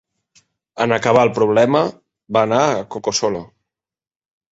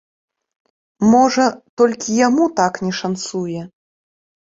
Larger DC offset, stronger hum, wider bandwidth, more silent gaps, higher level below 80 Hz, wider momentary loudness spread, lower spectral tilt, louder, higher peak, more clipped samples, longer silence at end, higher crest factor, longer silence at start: neither; neither; about the same, 8 kHz vs 7.8 kHz; second, none vs 1.69-1.77 s; about the same, -56 dBFS vs -58 dBFS; about the same, 9 LU vs 11 LU; about the same, -4.5 dB/octave vs -5 dB/octave; about the same, -17 LUFS vs -17 LUFS; about the same, 0 dBFS vs -2 dBFS; neither; first, 1.05 s vs 0.8 s; about the same, 18 dB vs 16 dB; second, 0.75 s vs 1 s